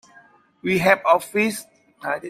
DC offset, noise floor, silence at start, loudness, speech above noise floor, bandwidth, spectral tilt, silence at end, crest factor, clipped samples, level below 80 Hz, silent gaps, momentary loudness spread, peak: under 0.1%; -53 dBFS; 0.65 s; -20 LUFS; 33 dB; 16 kHz; -4.5 dB/octave; 0 s; 22 dB; under 0.1%; -60 dBFS; none; 15 LU; 0 dBFS